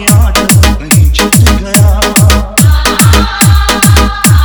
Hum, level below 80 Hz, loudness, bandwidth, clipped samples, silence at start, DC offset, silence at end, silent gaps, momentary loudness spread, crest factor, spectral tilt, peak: none; -12 dBFS; -6 LUFS; over 20 kHz; 4%; 0 s; 0.7%; 0 s; none; 1 LU; 6 dB; -4 dB/octave; 0 dBFS